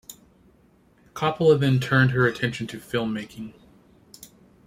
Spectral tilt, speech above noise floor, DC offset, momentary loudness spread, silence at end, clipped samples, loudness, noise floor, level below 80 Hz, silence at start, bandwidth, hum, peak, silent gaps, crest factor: -6.5 dB/octave; 36 dB; under 0.1%; 21 LU; 0.4 s; under 0.1%; -23 LUFS; -58 dBFS; -58 dBFS; 0.1 s; 16 kHz; none; -6 dBFS; none; 20 dB